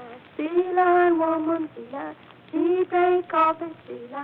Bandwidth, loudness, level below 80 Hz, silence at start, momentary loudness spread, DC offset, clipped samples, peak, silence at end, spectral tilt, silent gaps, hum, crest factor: 4.1 kHz; -22 LUFS; -72 dBFS; 0 s; 17 LU; under 0.1%; under 0.1%; -8 dBFS; 0 s; -8.5 dB/octave; none; none; 14 dB